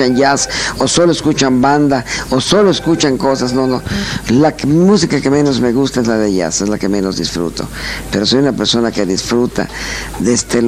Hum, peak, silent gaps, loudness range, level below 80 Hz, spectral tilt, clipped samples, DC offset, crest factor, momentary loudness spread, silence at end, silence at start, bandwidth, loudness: none; 0 dBFS; none; 3 LU; -34 dBFS; -4.5 dB/octave; under 0.1%; under 0.1%; 12 dB; 8 LU; 0 s; 0 s; 15 kHz; -13 LUFS